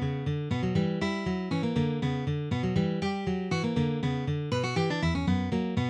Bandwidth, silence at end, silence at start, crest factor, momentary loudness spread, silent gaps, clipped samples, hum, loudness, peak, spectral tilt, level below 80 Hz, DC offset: 9.8 kHz; 0 s; 0 s; 14 dB; 3 LU; none; under 0.1%; none; -29 LUFS; -14 dBFS; -7 dB/octave; -48 dBFS; under 0.1%